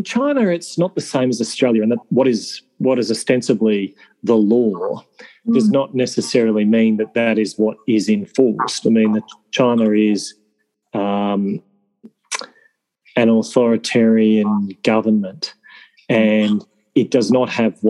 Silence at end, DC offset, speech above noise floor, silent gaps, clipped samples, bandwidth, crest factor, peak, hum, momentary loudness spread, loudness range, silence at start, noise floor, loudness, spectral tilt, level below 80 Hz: 0 s; under 0.1%; 51 dB; none; under 0.1%; 11.5 kHz; 16 dB; -2 dBFS; none; 10 LU; 3 LU; 0 s; -67 dBFS; -17 LUFS; -5.5 dB/octave; -70 dBFS